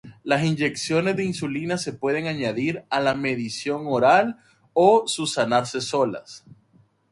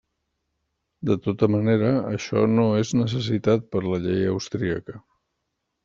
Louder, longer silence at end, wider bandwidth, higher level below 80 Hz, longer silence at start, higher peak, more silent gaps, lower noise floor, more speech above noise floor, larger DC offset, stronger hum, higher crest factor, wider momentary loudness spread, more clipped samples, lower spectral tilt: about the same, -23 LUFS vs -23 LUFS; about the same, 0.75 s vs 0.85 s; first, 11.5 kHz vs 7.6 kHz; about the same, -62 dBFS vs -58 dBFS; second, 0.05 s vs 1 s; about the same, -4 dBFS vs -6 dBFS; neither; second, -60 dBFS vs -78 dBFS; second, 37 dB vs 56 dB; neither; neither; about the same, 20 dB vs 18 dB; first, 10 LU vs 7 LU; neither; second, -4.5 dB/octave vs -7 dB/octave